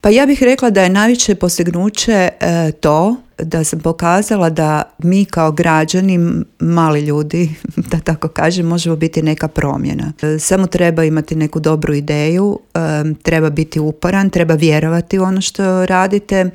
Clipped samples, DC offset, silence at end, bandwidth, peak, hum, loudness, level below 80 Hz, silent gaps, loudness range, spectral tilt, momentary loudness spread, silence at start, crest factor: under 0.1%; under 0.1%; 0.05 s; 16 kHz; 0 dBFS; none; -14 LUFS; -38 dBFS; none; 2 LU; -5.5 dB/octave; 6 LU; 0.05 s; 14 dB